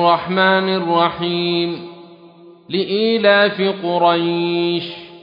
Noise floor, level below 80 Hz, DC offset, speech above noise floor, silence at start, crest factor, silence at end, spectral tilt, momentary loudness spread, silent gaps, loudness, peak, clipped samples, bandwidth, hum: -43 dBFS; -62 dBFS; under 0.1%; 27 dB; 0 s; 16 dB; 0 s; -8.5 dB/octave; 11 LU; none; -17 LUFS; -2 dBFS; under 0.1%; 5.4 kHz; none